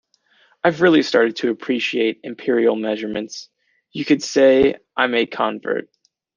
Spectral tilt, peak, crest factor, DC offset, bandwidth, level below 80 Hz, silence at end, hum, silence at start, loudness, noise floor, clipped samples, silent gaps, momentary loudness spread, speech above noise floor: -4.5 dB/octave; -2 dBFS; 16 dB; under 0.1%; 9.6 kHz; -58 dBFS; 0.55 s; none; 0.65 s; -19 LUFS; -58 dBFS; under 0.1%; none; 13 LU; 40 dB